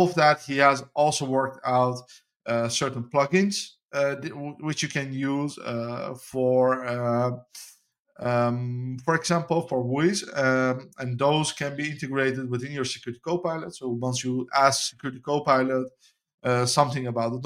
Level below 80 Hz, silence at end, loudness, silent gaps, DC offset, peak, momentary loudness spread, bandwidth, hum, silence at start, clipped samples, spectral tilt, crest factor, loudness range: -66 dBFS; 0 s; -25 LUFS; 3.85-3.89 s, 7.99-8.05 s, 16.34-16.38 s; under 0.1%; -4 dBFS; 11 LU; 15.5 kHz; none; 0 s; under 0.1%; -4.5 dB/octave; 22 dB; 3 LU